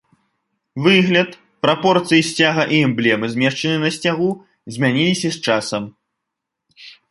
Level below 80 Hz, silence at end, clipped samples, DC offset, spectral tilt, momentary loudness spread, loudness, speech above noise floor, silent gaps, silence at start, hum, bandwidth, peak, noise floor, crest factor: -60 dBFS; 0.2 s; under 0.1%; under 0.1%; -5 dB/octave; 11 LU; -17 LUFS; 63 dB; none; 0.75 s; none; 11.5 kHz; 0 dBFS; -80 dBFS; 18 dB